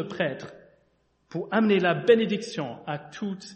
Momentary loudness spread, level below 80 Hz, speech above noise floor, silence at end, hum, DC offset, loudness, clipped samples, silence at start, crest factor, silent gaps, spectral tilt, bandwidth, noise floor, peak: 15 LU; -70 dBFS; 42 dB; 0 s; none; under 0.1%; -26 LUFS; under 0.1%; 0 s; 20 dB; none; -6 dB/octave; 8.4 kHz; -68 dBFS; -6 dBFS